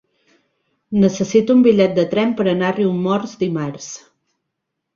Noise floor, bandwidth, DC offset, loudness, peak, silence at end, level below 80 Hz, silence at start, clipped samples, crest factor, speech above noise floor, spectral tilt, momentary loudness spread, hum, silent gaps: -77 dBFS; 7.4 kHz; under 0.1%; -17 LUFS; -2 dBFS; 1 s; -56 dBFS; 0.9 s; under 0.1%; 16 dB; 61 dB; -6.5 dB/octave; 14 LU; none; none